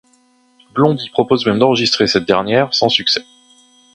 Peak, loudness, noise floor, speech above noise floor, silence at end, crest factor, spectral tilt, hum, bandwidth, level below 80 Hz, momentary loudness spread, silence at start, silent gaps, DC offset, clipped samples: 0 dBFS; -14 LUFS; -54 dBFS; 40 dB; 0.7 s; 16 dB; -4.5 dB/octave; none; 10.5 kHz; -52 dBFS; 4 LU; 0.75 s; none; under 0.1%; under 0.1%